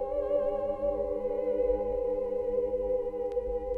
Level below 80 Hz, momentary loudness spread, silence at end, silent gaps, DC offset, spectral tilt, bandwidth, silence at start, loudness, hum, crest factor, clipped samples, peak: -46 dBFS; 3 LU; 0 s; none; under 0.1%; -9 dB/octave; 3.3 kHz; 0 s; -31 LUFS; none; 12 dB; under 0.1%; -18 dBFS